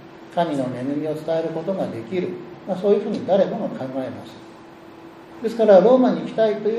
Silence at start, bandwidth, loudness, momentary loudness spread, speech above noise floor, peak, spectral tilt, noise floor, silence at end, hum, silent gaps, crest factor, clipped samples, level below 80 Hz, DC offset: 0 s; 12 kHz; -21 LUFS; 17 LU; 22 dB; -2 dBFS; -7.5 dB/octave; -42 dBFS; 0 s; none; none; 18 dB; under 0.1%; -66 dBFS; under 0.1%